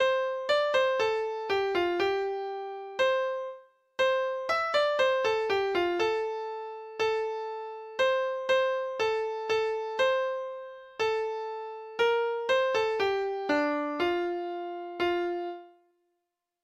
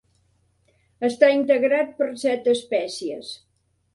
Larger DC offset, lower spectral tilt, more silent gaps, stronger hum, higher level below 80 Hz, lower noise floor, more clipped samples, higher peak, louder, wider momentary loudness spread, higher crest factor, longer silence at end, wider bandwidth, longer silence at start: neither; about the same, -3.5 dB/octave vs -3.5 dB/octave; neither; neither; about the same, -68 dBFS vs -70 dBFS; first, -83 dBFS vs -65 dBFS; neither; second, -14 dBFS vs -2 dBFS; second, -29 LUFS vs -22 LUFS; second, 11 LU vs 15 LU; second, 14 dB vs 20 dB; first, 0.95 s vs 0.6 s; second, 8.6 kHz vs 11.5 kHz; second, 0 s vs 1 s